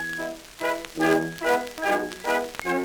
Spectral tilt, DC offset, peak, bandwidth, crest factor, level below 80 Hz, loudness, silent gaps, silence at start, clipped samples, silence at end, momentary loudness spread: -4 dB/octave; under 0.1%; -10 dBFS; over 20 kHz; 18 dB; -56 dBFS; -26 LUFS; none; 0 s; under 0.1%; 0 s; 8 LU